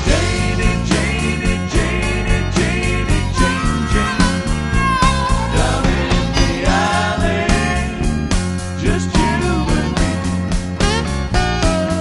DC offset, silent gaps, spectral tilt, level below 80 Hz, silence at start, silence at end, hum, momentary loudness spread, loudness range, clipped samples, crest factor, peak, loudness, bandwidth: under 0.1%; none; -5 dB/octave; -22 dBFS; 0 s; 0 s; none; 4 LU; 2 LU; under 0.1%; 14 dB; 0 dBFS; -17 LUFS; 11.5 kHz